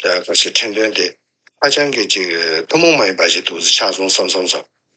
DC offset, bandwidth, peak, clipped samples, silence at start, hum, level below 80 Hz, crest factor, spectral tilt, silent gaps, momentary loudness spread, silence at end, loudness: under 0.1%; 9.4 kHz; 0 dBFS; under 0.1%; 0 s; none; -70 dBFS; 14 dB; -1.5 dB/octave; none; 6 LU; 0.35 s; -13 LUFS